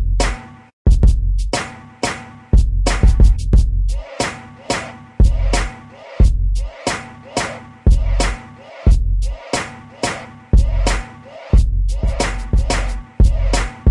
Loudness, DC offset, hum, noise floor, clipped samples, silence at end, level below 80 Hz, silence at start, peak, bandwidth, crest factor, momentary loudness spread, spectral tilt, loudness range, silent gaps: -19 LUFS; under 0.1%; none; -36 dBFS; under 0.1%; 0 s; -16 dBFS; 0 s; 0 dBFS; 11.5 kHz; 14 dB; 12 LU; -5 dB/octave; 3 LU; 0.73-0.85 s